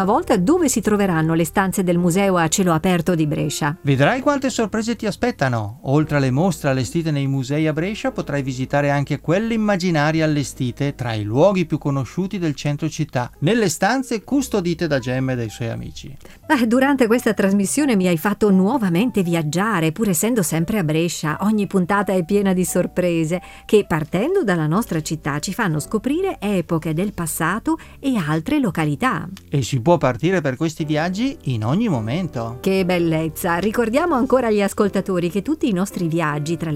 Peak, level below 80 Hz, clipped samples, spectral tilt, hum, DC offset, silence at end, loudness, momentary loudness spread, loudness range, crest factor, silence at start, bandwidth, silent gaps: -2 dBFS; -44 dBFS; under 0.1%; -5.5 dB/octave; none; under 0.1%; 0 s; -20 LUFS; 7 LU; 3 LU; 18 dB; 0 s; 16.5 kHz; none